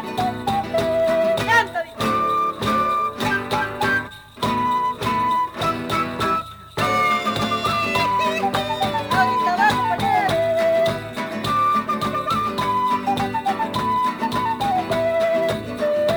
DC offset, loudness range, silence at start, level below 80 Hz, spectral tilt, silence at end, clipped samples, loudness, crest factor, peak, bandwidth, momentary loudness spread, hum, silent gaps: under 0.1%; 2 LU; 0 s; -48 dBFS; -4.5 dB/octave; 0 s; under 0.1%; -21 LUFS; 16 dB; -4 dBFS; over 20 kHz; 6 LU; none; none